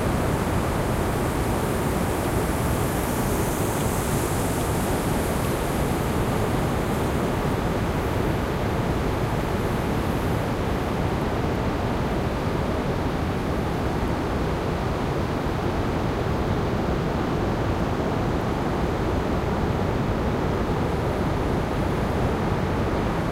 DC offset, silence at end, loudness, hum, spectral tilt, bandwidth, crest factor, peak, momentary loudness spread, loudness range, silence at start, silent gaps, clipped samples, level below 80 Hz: under 0.1%; 0 s; -25 LUFS; none; -6 dB/octave; 16 kHz; 14 dB; -10 dBFS; 1 LU; 1 LU; 0 s; none; under 0.1%; -32 dBFS